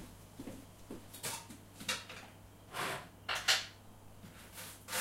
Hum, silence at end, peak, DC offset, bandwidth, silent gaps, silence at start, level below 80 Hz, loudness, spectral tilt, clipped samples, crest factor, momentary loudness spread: none; 0 s; -16 dBFS; under 0.1%; 16 kHz; none; 0 s; -64 dBFS; -38 LUFS; -1 dB/octave; under 0.1%; 26 dB; 23 LU